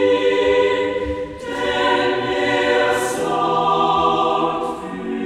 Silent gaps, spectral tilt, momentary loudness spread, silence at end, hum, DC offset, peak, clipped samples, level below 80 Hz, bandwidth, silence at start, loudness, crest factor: none; -4 dB/octave; 9 LU; 0 s; none; under 0.1%; -6 dBFS; under 0.1%; -44 dBFS; 14 kHz; 0 s; -18 LUFS; 12 dB